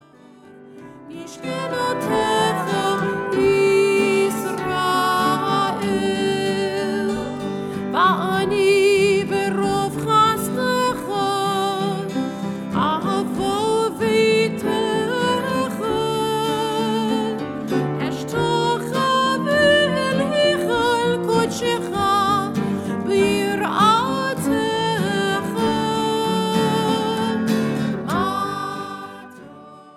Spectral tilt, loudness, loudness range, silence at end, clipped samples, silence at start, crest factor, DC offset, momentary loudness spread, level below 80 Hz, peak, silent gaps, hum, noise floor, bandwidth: -5 dB/octave; -20 LUFS; 3 LU; 0.05 s; under 0.1%; 0.45 s; 16 dB; under 0.1%; 8 LU; -52 dBFS; -4 dBFS; none; none; -46 dBFS; 16.5 kHz